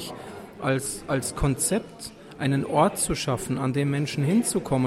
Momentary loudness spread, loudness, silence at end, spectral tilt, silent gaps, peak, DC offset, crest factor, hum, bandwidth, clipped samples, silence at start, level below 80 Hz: 16 LU; -25 LUFS; 0 s; -5 dB/octave; none; -8 dBFS; under 0.1%; 18 dB; none; 15 kHz; under 0.1%; 0 s; -44 dBFS